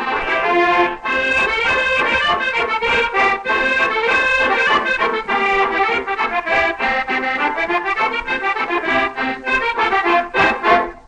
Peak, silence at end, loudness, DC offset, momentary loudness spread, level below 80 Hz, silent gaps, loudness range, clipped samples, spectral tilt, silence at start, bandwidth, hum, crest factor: -2 dBFS; 0.1 s; -16 LUFS; under 0.1%; 4 LU; -44 dBFS; none; 3 LU; under 0.1%; -3.5 dB/octave; 0 s; 10.5 kHz; none; 16 dB